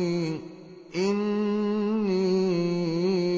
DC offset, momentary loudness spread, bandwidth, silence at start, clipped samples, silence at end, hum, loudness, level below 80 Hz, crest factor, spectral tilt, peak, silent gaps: under 0.1%; 11 LU; 7.6 kHz; 0 s; under 0.1%; 0 s; none; -26 LUFS; -70 dBFS; 10 dB; -7 dB/octave; -16 dBFS; none